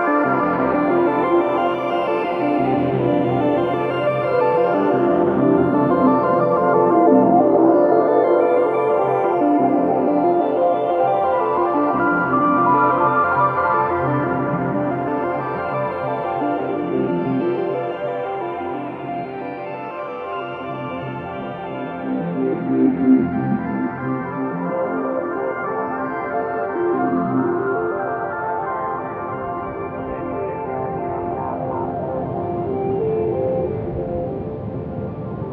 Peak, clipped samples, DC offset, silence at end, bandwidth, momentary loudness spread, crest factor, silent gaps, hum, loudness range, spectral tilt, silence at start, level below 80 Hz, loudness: -2 dBFS; under 0.1%; under 0.1%; 0 s; 5 kHz; 12 LU; 18 dB; none; none; 10 LU; -10 dB/octave; 0 s; -50 dBFS; -19 LUFS